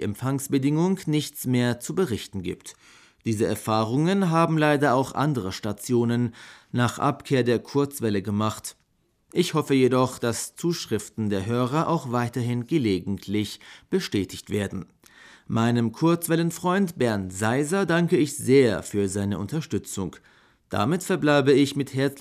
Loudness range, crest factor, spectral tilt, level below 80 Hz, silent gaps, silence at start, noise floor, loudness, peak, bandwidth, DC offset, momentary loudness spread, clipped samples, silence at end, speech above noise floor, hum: 3 LU; 18 dB; -6 dB/octave; -62 dBFS; none; 0 s; -68 dBFS; -24 LUFS; -6 dBFS; 16 kHz; under 0.1%; 10 LU; under 0.1%; 0 s; 44 dB; none